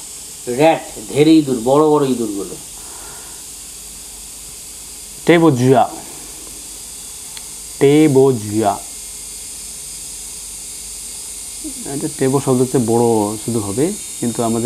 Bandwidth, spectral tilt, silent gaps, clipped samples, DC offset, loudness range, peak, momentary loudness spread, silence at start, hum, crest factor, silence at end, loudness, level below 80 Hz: 15 kHz; -5 dB/octave; none; under 0.1%; under 0.1%; 8 LU; 0 dBFS; 18 LU; 0 s; none; 18 dB; 0 s; -16 LUFS; -48 dBFS